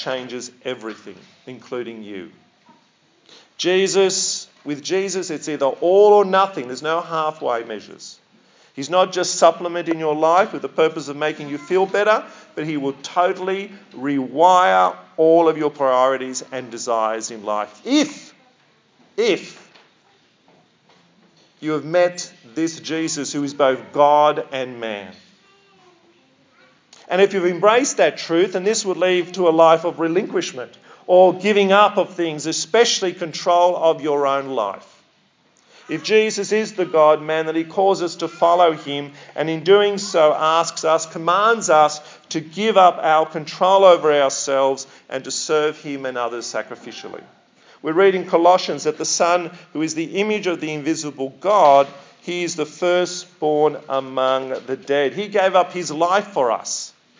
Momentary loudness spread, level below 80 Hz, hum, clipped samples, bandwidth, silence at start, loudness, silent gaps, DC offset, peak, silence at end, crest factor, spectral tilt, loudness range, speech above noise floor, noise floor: 16 LU; -82 dBFS; none; under 0.1%; 7.8 kHz; 0 s; -18 LUFS; none; under 0.1%; 0 dBFS; 0.3 s; 18 dB; -3.5 dB/octave; 8 LU; 41 dB; -59 dBFS